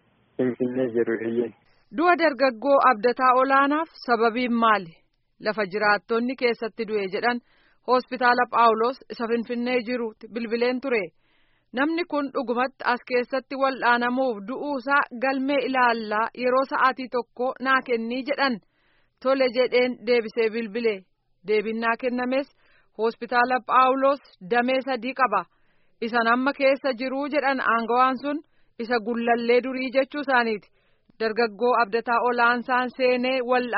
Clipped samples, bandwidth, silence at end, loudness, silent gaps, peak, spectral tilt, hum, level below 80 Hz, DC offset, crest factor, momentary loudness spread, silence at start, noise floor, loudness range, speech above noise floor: under 0.1%; 5.8 kHz; 0 s; -23 LUFS; none; -6 dBFS; -2 dB/octave; none; -68 dBFS; under 0.1%; 18 dB; 10 LU; 0.4 s; -65 dBFS; 5 LU; 42 dB